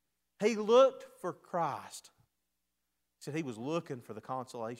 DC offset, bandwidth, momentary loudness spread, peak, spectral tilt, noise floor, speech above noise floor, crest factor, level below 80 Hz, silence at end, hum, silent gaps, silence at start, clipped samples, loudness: under 0.1%; 14.5 kHz; 19 LU; -12 dBFS; -5 dB/octave; -85 dBFS; 52 dB; 22 dB; -86 dBFS; 0.05 s; 60 Hz at -75 dBFS; none; 0.4 s; under 0.1%; -33 LUFS